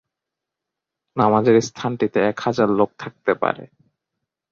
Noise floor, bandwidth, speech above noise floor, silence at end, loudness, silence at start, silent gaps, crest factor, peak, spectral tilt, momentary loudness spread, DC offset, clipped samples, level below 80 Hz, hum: -84 dBFS; 7.6 kHz; 65 dB; 0.85 s; -20 LUFS; 1.15 s; none; 18 dB; -2 dBFS; -6 dB/octave; 10 LU; under 0.1%; under 0.1%; -60 dBFS; none